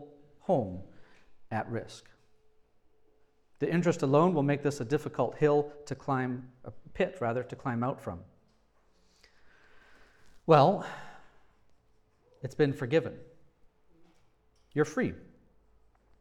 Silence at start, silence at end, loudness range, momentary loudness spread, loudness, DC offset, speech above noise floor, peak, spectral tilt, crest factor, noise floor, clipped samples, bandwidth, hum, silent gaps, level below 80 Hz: 0 s; 1 s; 9 LU; 21 LU; -30 LUFS; under 0.1%; 37 dB; -8 dBFS; -7 dB/octave; 24 dB; -66 dBFS; under 0.1%; 12.5 kHz; none; none; -66 dBFS